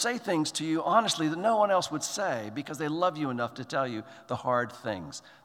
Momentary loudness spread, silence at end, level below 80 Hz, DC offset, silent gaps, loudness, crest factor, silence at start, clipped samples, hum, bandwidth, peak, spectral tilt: 11 LU; 0.15 s; -74 dBFS; under 0.1%; none; -29 LUFS; 20 dB; 0 s; under 0.1%; none; 16.5 kHz; -10 dBFS; -4 dB/octave